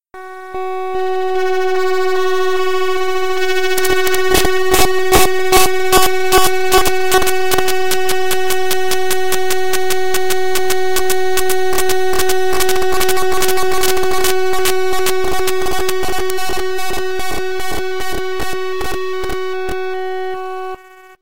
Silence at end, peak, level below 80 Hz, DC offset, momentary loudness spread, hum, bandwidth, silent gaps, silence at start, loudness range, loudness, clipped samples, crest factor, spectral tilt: 0 s; 0 dBFS; -34 dBFS; 20%; 9 LU; none; 17.5 kHz; none; 0 s; 8 LU; -16 LUFS; under 0.1%; 16 dB; -2.5 dB/octave